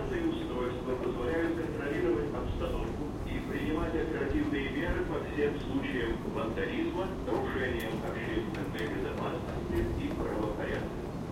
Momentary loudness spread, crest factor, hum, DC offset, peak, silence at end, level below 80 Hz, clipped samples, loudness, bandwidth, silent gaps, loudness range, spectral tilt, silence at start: 4 LU; 14 dB; none; under 0.1%; -18 dBFS; 0 s; -42 dBFS; under 0.1%; -34 LUFS; 16.5 kHz; none; 1 LU; -7 dB/octave; 0 s